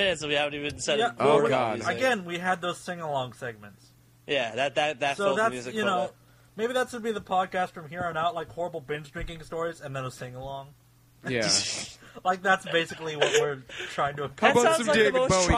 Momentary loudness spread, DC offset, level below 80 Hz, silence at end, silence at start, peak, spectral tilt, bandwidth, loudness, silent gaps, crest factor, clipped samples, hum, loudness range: 15 LU; under 0.1%; -48 dBFS; 0 s; 0 s; -6 dBFS; -3.5 dB/octave; 15.5 kHz; -27 LUFS; none; 22 dB; under 0.1%; none; 6 LU